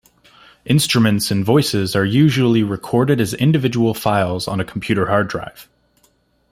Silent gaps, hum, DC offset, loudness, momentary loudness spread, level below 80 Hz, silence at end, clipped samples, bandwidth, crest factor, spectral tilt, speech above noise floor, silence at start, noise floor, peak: none; none; under 0.1%; -17 LUFS; 8 LU; -50 dBFS; 0.9 s; under 0.1%; 16 kHz; 16 dB; -5.5 dB/octave; 43 dB; 0.65 s; -59 dBFS; -2 dBFS